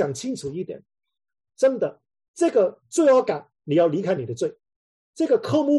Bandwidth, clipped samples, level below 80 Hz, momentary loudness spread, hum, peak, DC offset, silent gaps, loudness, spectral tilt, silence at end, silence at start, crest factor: 12 kHz; under 0.1%; -68 dBFS; 13 LU; none; -8 dBFS; under 0.1%; 2.28-2.34 s, 4.76-5.13 s; -23 LUFS; -6 dB/octave; 0 s; 0 s; 16 dB